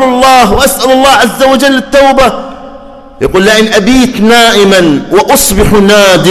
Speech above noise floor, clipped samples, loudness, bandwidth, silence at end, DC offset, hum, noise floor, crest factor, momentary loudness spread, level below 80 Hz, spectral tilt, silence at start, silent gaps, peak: 23 dB; 1%; -5 LUFS; 19.5 kHz; 0 s; under 0.1%; none; -28 dBFS; 6 dB; 4 LU; -24 dBFS; -3.5 dB/octave; 0 s; none; 0 dBFS